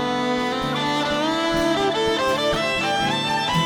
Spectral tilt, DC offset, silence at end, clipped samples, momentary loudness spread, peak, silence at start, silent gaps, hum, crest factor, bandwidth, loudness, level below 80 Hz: -4 dB/octave; under 0.1%; 0 s; under 0.1%; 2 LU; -10 dBFS; 0 s; none; none; 12 dB; over 20 kHz; -21 LUFS; -46 dBFS